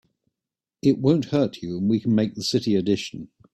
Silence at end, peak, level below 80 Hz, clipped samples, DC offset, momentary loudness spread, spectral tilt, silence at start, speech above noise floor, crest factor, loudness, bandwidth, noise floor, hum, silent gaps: 0.3 s; -6 dBFS; -60 dBFS; under 0.1%; under 0.1%; 6 LU; -6.5 dB/octave; 0.85 s; 66 dB; 16 dB; -23 LUFS; 12.5 kHz; -88 dBFS; none; none